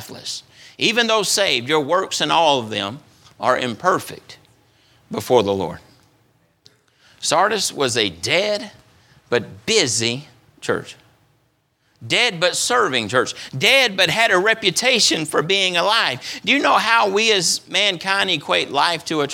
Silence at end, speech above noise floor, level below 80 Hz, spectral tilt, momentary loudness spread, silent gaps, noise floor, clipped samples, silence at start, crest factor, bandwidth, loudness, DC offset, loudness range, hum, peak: 0 s; 45 dB; -62 dBFS; -2 dB/octave; 11 LU; none; -64 dBFS; under 0.1%; 0 s; 18 dB; 19 kHz; -17 LUFS; under 0.1%; 7 LU; none; 0 dBFS